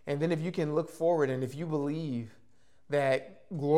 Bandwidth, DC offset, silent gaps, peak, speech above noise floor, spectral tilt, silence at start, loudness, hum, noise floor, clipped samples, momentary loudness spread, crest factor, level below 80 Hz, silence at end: 14.5 kHz; 0.2%; none; -14 dBFS; 37 dB; -7.5 dB/octave; 0.05 s; -31 LUFS; none; -67 dBFS; under 0.1%; 9 LU; 18 dB; -74 dBFS; 0 s